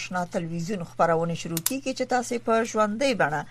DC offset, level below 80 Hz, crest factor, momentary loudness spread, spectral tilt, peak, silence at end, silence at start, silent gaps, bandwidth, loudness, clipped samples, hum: under 0.1%; -56 dBFS; 22 dB; 7 LU; -4.5 dB/octave; -4 dBFS; 0 s; 0 s; none; 14.5 kHz; -26 LUFS; under 0.1%; none